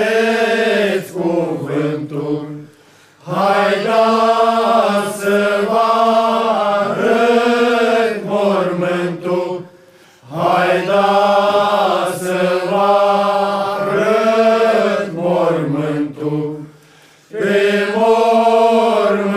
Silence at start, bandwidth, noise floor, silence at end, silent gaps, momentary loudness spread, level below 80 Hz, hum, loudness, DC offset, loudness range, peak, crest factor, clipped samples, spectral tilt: 0 s; 15.5 kHz; -47 dBFS; 0 s; none; 8 LU; -68 dBFS; none; -15 LUFS; 0.1%; 4 LU; -2 dBFS; 12 dB; under 0.1%; -5.5 dB/octave